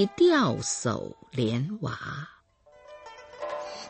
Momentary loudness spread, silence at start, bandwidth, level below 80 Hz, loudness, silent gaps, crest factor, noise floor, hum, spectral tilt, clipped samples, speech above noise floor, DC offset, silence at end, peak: 25 LU; 0 s; 8.8 kHz; -62 dBFS; -28 LUFS; none; 16 dB; -57 dBFS; none; -5 dB/octave; under 0.1%; 30 dB; under 0.1%; 0 s; -12 dBFS